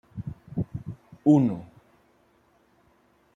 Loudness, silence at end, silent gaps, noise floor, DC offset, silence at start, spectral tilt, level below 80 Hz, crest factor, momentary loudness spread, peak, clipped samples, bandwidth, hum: -25 LUFS; 1.7 s; none; -63 dBFS; under 0.1%; 0.15 s; -10 dB/octave; -58 dBFS; 22 dB; 19 LU; -8 dBFS; under 0.1%; 7.4 kHz; none